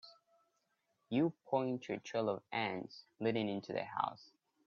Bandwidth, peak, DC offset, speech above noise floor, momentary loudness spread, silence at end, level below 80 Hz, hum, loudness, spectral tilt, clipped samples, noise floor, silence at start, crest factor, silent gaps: 7.2 kHz; -20 dBFS; under 0.1%; 44 dB; 6 LU; 0.4 s; -82 dBFS; none; -39 LUFS; -4.5 dB/octave; under 0.1%; -82 dBFS; 0.05 s; 20 dB; none